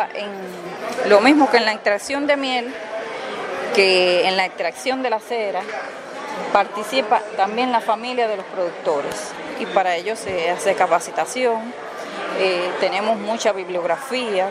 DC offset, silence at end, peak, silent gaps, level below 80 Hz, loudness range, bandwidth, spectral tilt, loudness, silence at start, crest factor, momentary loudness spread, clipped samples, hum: under 0.1%; 0 s; 0 dBFS; none; -66 dBFS; 3 LU; 15.5 kHz; -3 dB/octave; -20 LUFS; 0 s; 20 dB; 14 LU; under 0.1%; none